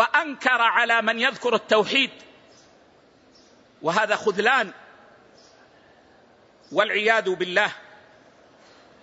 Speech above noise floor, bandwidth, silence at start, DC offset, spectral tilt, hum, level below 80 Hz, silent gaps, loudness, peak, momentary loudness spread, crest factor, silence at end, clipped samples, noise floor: 34 dB; 8 kHz; 0 s; under 0.1%; -3 dB/octave; none; -74 dBFS; none; -21 LUFS; -4 dBFS; 8 LU; 20 dB; 1.2 s; under 0.1%; -56 dBFS